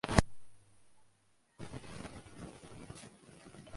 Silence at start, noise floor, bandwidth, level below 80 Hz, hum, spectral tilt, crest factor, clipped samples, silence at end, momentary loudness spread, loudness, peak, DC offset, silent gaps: 0.05 s; -73 dBFS; 11.5 kHz; -48 dBFS; none; -5 dB/octave; 34 dB; under 0.1%; 0 s; 21 LU; -42 LUFS; -6 dBFS; under 0.1%; none